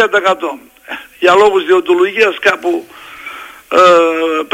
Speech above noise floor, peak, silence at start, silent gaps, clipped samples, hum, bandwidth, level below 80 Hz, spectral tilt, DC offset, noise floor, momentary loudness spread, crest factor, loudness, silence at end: 20 dB; 0 dBFS; 0 s; none; under 0.1%; none; 16 kHz; -56 dBFS; -3.5 dB/octave; under 0.1%; -30 dBFS; 20 LU; 12 dB; -11 LUFS; 0.05 s